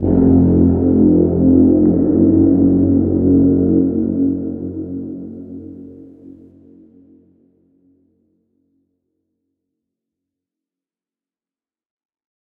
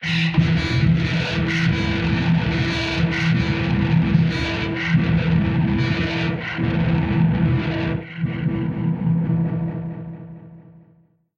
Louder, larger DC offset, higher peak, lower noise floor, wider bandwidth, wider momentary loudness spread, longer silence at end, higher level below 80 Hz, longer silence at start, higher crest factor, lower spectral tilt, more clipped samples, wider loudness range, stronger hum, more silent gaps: first, -13 LUFS vs -20 LUFS; neither; about the same, -2 dBFS vs -4 dBFS; first, under -90 dBFS vs -56 dBFS; second, 1.8 kHz vs 7.2 kHz; first, 18 LU vs 7 LU; first, 6.2 s vs 0.75 s; about the same, -40 dBFS vs -36 dBFS; about the same, 0 s vs 0 s; about the same, 16 dB vs 16 dB; first, -15 dB/octave vs -7 dB/octave; neither; first, 19 LU vs 4 LU; neither; neither